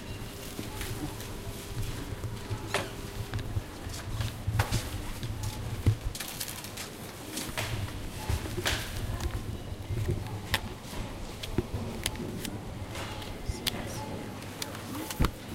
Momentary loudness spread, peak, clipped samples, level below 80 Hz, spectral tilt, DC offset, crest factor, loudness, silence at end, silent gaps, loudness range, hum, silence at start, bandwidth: 9 LU; -6 dBFS; under 0.1%; -42 dBFS; -4.5 dB/octave; under 0.1%; 28 dB; -35 LUFS; 0 s; none; 3 LU; none; 0 s; 17 kHz